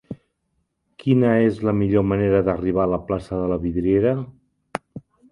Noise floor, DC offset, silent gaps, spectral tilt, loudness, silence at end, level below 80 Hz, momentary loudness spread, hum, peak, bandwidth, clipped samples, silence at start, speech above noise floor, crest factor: -72 dBFS; under 0.1%; none; -9.5 dB/octave; -20 LUFS; 0.35 s; -44 dBFS; 16 LU; none; -2 dBFS; 11 kHz; under 0.1%; 0.1 s; 53 dB; 20 dB